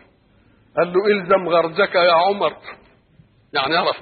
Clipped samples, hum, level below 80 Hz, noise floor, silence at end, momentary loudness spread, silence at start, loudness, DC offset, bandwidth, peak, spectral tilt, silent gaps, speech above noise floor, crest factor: under 0.1%; none; -62 dBFS; -55 dBFS; 0 s; 11 LU; 0.75 s; -18 LUFS; under 0.1%; 4.8 kHz; -4 dBFS; -9.5 dB/octave; none; 38 dB; 16 dB